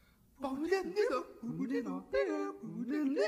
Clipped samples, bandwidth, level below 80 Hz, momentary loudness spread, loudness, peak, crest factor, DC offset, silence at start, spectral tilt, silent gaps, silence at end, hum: under 0.1%; 15.5 kHz; -68 dBFS; 8 LU; -37 LUFS; -20 dBFS; 16 dB; under 0.1%; 0.4 s; -6 dB/octave; none; 0 s; none